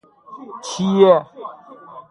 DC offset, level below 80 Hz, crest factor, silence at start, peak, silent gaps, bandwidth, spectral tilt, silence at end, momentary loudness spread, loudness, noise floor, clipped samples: under 0.1%; -64 dBFS; 18 dB; 0.3 s; 0 dBFS; none; 11.5 kHz; -6 dB/octave; 0.1 s; 23 LU; -15 LUFS; -40 dBFS; under 0.1%